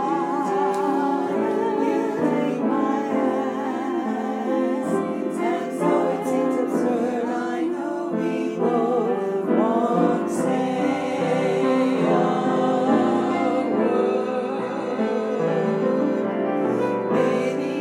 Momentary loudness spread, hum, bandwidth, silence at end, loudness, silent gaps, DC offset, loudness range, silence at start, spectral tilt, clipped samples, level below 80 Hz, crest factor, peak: 5 LU; none; 13.5 kHz; 0 s; -22 LUFS; none; under 0.1%; 3 LU; 0 s; -7 dB/octave; under 0.1%; -78 dBFS; 14 dB; -8 dBFS